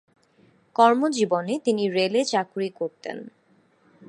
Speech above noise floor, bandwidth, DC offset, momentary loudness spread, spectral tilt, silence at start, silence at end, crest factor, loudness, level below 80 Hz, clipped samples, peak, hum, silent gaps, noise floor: 39 dB; 11.5 kHz; under 0.1%; 15 LU; -4.5 dB/octave; 0.8 s; 0.8 s; 22 dB; -23 LUFS; -78 dBFS; under 0.1%; -2 dBFS; none; none; -62 dBFS